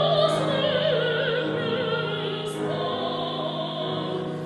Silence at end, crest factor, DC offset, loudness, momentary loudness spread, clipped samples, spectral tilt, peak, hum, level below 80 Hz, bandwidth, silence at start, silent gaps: 0 s; 16 dB; under 0.1%; -25 LUFS; 6 LU; under 0.1%; -5.5 dB/octave; -10 dBFS; none; -64 dBFS; 12 kHz; 0 s; none